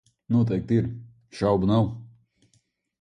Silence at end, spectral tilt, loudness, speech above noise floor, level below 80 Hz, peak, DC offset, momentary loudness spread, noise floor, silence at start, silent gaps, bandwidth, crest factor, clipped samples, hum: 0.95 s; -9 dB/octave; -24 LUFS; 46 dB; -50 dBFS; -8 dBFS; under 0.1%; 21 LU; -68 dBFS; 0.3 s; none; 9.6 kHz; 18 dB; under 0.1%; none